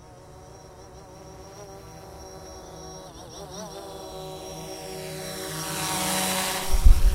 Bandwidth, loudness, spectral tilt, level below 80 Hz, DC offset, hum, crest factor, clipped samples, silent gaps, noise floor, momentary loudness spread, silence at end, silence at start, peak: 16 kHz; -29 LUFS; -3.5 dB/octave; -28 dBFS; under 0.1%; none; 22 dB; under 0.1%; none; -46 dBFS; 22 LU; 0 s; 0.1 s; -4 dBFS